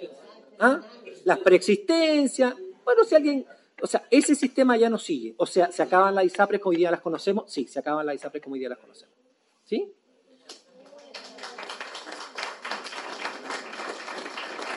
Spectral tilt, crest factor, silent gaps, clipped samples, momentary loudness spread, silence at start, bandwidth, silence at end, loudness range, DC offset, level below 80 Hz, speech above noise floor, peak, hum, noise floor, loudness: -4 dB/octave; 20 dB; none; under 0.1%; 17 LU; 0 s; 11.5 kHz; 0 s; 16 LU; under 0.1%; -82 dBFS; 44 dB; -6 dBFS; none; -66 dBFS; -24 LUFS